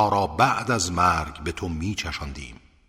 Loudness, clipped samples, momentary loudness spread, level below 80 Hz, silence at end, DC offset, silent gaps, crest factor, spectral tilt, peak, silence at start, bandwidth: -24 LUFS; under 0.1%; 14 LU; -40 dBFS; 0.35 s; under 0.1%; none; 22 dB; -4 dB/octave; -2 dBFS; 0 s; 16 kHz